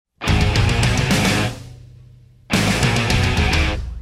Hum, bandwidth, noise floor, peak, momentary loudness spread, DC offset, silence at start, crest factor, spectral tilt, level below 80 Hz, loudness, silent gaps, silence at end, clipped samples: none; 16 kHz; -46 dBFS; -2 dBFS; 5 LU; under 0.1%; 0.2 s; 16 dB; -4.5 dB/octave; -26 dBFS; -18 LUFS; none; 0 s; under 0.1%